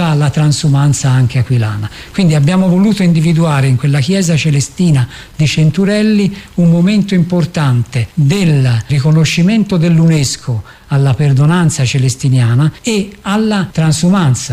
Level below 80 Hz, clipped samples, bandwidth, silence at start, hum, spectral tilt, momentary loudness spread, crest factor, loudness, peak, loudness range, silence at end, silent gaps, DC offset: -40 dBFS; under 0.1%; 14.5 kHz; 0 s; none; -6 dB/octave; 6 LU; 8 dB; -11 LUFS; -2 dBFS; 1 LU; 0 s; none; under 0.1%